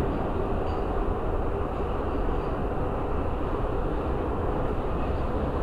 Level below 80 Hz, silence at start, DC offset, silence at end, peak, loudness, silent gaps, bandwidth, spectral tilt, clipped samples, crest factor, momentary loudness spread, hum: -30 dBFS; 0 s; 0.4%; 0 s; -14 dBFS; -30 LUFS; none; 5.2 kHz; -9 dB/octave; under 0.1%; 12 dB; 1 LU; none